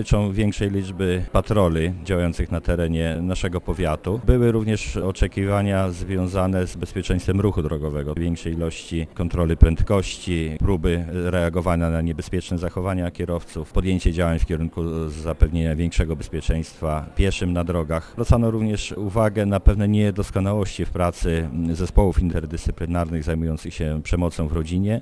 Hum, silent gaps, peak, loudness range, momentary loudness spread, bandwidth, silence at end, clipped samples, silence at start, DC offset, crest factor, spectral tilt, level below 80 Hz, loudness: none; none; 0 dBFS; 3 LU; 7 LU; 11 kHz; 0 s; under 0.1%; 0 s; under 0.1%; 20 dB; -7 dB/octave; -28 dBFS; -23 LUFS